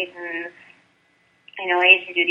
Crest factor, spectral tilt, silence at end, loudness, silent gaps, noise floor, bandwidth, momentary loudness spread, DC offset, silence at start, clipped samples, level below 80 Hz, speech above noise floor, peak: 22 dB; -3.5 dB/octave; 0 s; -17 LUFS; none; -62 dBFS; 7 kHz; 18 LU; under 0.1%; 0 s; under 0.1%; -80 dBFS; 41 dB; -2 dBFS